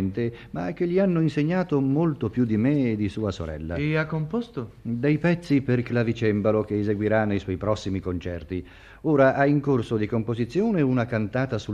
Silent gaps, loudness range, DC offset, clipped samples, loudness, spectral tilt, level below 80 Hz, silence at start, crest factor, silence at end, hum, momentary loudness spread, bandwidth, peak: none; 2 LU; under 0.1%; under 0.1%; -25 LUFS; -8.5 dB/octave; -50 dBFS; 0 s; 18 dB; 0 s; none; 10 LU; 9.2 kHz; -6 dBFS